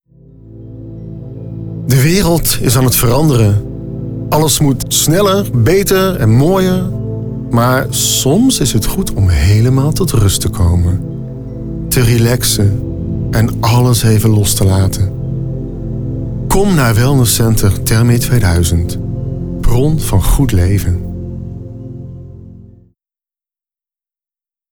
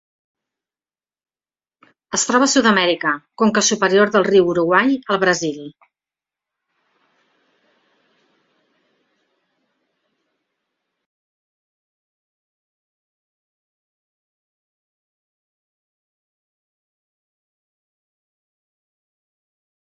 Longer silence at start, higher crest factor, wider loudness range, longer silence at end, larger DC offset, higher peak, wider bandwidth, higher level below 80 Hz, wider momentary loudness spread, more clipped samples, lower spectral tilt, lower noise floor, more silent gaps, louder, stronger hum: second, 0.45 s vs 2.1 s; second, 10 dB vs 22 dB; second, 4 LU vs 9 LU; second, 2.1 s vs 14.3 s; neither; about the same, -2 dBFS vs -2 dBFS; first, over 20 kHz vs 8 kHz; first, -24 dBFS vs -66 dBFS; first, 15 LU vs 9 LU; neither; first, -5 dB/octave vs -3 dB/octave; about the same, under -90 dBFS vs under -90 dBFS; neither; first, -12 LUFS vs -16 LUFS; neither